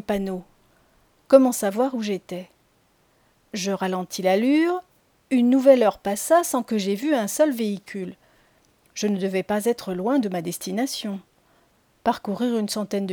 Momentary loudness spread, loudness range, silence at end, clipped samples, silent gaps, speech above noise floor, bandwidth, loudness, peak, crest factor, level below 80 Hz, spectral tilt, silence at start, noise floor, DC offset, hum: 14 LU; 6 LU; 0 s; under 0.1%; none; 41 dB; over 20 kHz; -22 LUFS; -2 dBFS; 22 dB; -62 dBFS; -5 dB/octave; 0.1 s; -63 dBFS; under 0.1%; none